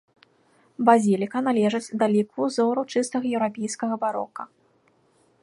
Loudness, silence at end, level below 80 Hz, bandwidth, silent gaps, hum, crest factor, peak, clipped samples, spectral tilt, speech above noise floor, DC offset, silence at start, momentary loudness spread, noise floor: -23 LUFS; 0.95 s; -74 dBFS; 11.5 kHz; none; none; 22 dB; -2 dBFS; under 0.1%; -5.5 dB/octave; 40 dB; under 0.1%; 0.8 s; 10 LU; -63 dBFS